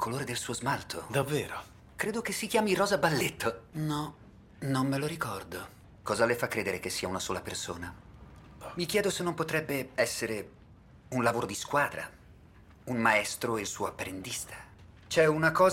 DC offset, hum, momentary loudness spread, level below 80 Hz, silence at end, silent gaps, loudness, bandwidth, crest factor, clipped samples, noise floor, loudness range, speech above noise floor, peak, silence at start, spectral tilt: under 0.1%; none; 16 LU; -60 dBFS; 0 s; none; -31 LUFS; 16.5 kHz; 22 dB; under 0.1%; -55 dBFS; 3 LU; 25 dB; -10 dBFS; 0 s; -4 dB/octave